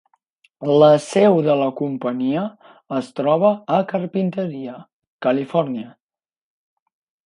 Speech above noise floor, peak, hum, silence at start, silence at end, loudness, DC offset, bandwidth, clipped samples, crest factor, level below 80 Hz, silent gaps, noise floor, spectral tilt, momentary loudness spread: 43 dB; -2 dBFS; none; 0.6 s; 1.35 s; -19 LUFS; under 0.1%; 11 kHz; under 0.1%; 18 dB; -70 dBFS; 4.93-5.00 s, 5.07-5.19 s; -62 dBFS; -7 dB/octave; 14 LU